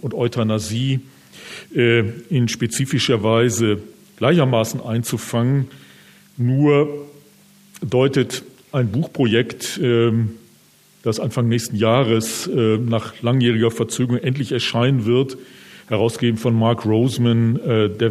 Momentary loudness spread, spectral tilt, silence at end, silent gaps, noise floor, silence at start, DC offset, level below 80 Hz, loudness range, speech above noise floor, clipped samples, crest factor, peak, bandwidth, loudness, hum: 8 LU; -6 dB/octave; 0 s; none; -52 dBFS; 0.05 s; under 0.1%; -62 dBFS; 2 LU; 34 dB; under 0.1%; 18 dB; -2 dBFS; 15 kHz; -19 LUFS; none